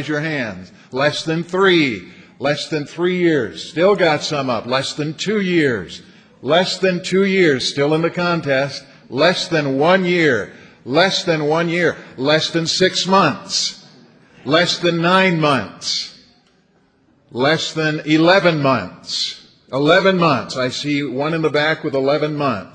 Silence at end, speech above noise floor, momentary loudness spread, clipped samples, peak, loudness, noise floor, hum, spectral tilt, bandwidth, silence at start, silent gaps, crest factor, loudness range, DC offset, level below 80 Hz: 0.05 s; 40 dB; 10 LU; under 0.1%; 0 dBFS; -17 LUFS; -57 dBFS; none; -4.5 dB/octave; 10 kHz; 0 s; none; 18 dB; 2 LU; under 0.1%; -58 dBFS